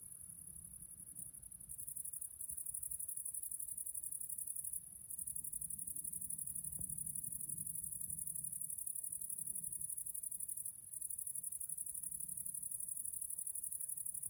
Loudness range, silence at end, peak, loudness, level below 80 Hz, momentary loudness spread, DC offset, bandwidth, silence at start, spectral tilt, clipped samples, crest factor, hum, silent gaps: 2 LU; 0 s; -26 dBFS; -43 LUFS; -72 dBFS; 8 LU; under 0.1%; over 20 kHz; 0 s; -2.5 dB/octave; under 0.1%; 20 dB; none; none